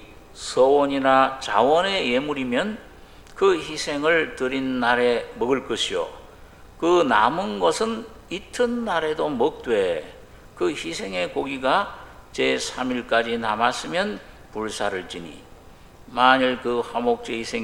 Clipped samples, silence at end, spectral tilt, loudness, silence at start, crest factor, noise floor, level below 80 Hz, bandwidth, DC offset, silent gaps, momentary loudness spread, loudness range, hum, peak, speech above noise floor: under 0.1%; 0 s; -3.5 dB/octave; -22 LUFS; 0 s; 22 dB; -46 dBFS; -50 dBFS; 15.5 kHz; under 0.1%; none; 14 LU; 4 LU; none; 0 dBFS; 24 dB